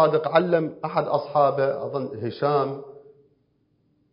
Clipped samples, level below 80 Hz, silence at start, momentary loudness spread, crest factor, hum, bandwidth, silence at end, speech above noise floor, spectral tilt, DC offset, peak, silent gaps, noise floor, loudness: under 0.1%; -70 dBFS; 0 s; 10 LU; 20 dB; none; 5.4 kHz; 1.15 s; 44 dB; -11 dB/octave; under 0.1%; -4 dBFS; none; -67 dBFS; -23 LUFS